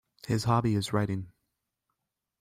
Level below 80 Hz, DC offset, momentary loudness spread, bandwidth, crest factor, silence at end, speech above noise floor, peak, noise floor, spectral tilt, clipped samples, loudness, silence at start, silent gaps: -58 dBFS; under 0.1%; 10 LU; 15.5 kHz; 18 dB; 1.1 s; 57 dB; -14 dBFS; -84 dBFS; -6.5 dB/octave; under 0.1%; -29 LUFS; 0.25 s; none